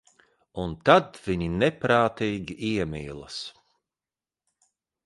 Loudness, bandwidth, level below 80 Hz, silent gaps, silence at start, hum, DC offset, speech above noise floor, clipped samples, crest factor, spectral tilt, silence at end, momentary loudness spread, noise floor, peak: -25 LUFS; 11.5 kHz; -50 dBFS; none; 0.55 s; none; under 0.1%; over 65 dB; under 0.1%; 24 dB; -6 dB/octave; 1.55 s; 16 LU; under -90 dBFS; -4 dBFS